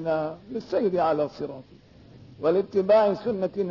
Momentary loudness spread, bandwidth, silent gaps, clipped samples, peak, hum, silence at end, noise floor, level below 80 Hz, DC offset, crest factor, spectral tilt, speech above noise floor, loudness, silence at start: 16 LU; 6 kHz; none; under 0.1%; -10 dBFS; none; 0 s; -50 dBFS; -62 dBFS; under 0.1%; 14 dB; -8 dB/octave; 25 dB; -25 LUFS; 0 s